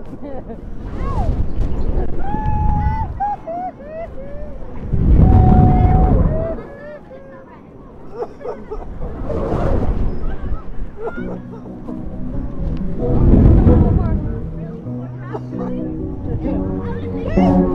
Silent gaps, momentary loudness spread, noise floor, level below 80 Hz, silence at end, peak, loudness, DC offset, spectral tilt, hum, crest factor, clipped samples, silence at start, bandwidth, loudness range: none; 20 LU; -38 dBFS; -20 dBFS; 0 s; 0 dBFS; -19 LUFS; under 0.1%; -11 dB/octave; none; 16 dB; under 0.1%; 0 s; 5.6 kHz; 10 LU